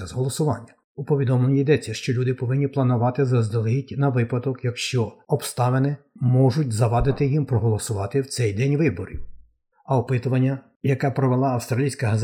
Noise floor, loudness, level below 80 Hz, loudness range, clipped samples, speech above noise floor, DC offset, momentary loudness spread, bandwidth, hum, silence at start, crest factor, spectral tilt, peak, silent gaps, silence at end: -52 dBFS; -22 LUFS; -44 dBFS; 2 LU; under 0.1%; 31 dB; under 0.1%; 6 LU; 15 kHz; none; 0 s; 16 dB; -7 dB/octave; -6 dBFS; 0.84-0.95 s, 10.76-10.80 s; 0 s